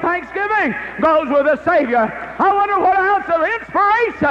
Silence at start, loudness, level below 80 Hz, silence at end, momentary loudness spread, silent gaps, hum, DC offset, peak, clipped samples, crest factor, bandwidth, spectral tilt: 0 s; -16 LUFS; -48 dBFS; 0 s; 4 LU; none; none; under 0.1%; -4 dBFS; under 0.1%; 10 dB; 8.2 kHz; -6.5 dB/octave